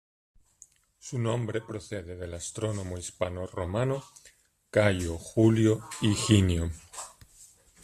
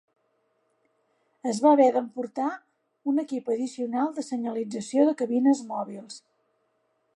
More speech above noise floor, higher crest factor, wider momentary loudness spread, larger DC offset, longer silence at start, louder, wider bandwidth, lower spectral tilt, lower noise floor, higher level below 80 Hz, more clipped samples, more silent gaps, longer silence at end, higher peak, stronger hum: second, 31 dB vs 47 dB; about the same, 22 dB vs 18 dB; about the same, 16 LU vs 15 LU; neither; second, 1.05 s vs 1.45 s; second, -29 LUFS vs -26 LUFS; first, 13.5 kHz vs 11 kHz; about the same, -5.5 dB/octave vs -5.5 dB/octave; second, -59 dBFS vs -72 dBFS; first, -52 dBFS vs -84 dBFS; neither; neither; second, 0.4 s vs 0.95 s; about the same, -8 dBFS vs -8 dBFS; neither